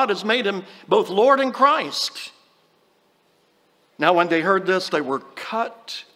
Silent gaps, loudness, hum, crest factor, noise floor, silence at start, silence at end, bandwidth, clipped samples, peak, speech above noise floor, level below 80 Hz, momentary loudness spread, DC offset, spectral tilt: none; -20 LUFS; none; 20 dB; -62 dBFS; 0 s; 0.15 s; 16 kHz; under 0.1%; -2 dBFS; 41 dB; -78 dBFS; 12 LU; under 0.1%; -4 dB/octave